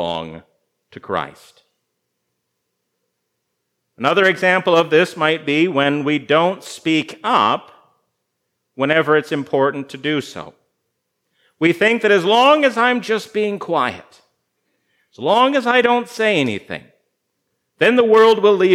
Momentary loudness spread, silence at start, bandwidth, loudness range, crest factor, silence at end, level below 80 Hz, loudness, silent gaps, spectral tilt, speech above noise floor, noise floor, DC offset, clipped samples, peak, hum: 12 LU; 0 s; 14 kHz; 5 LU; 18 dB; 0 s; -70 dBFS; -16 LUFS; none; -5 dB/octave; 58 dB; -74 dBFS; under 0.1%; under 0.1%; 0 dBFS; 60 Hz at -55 dBFS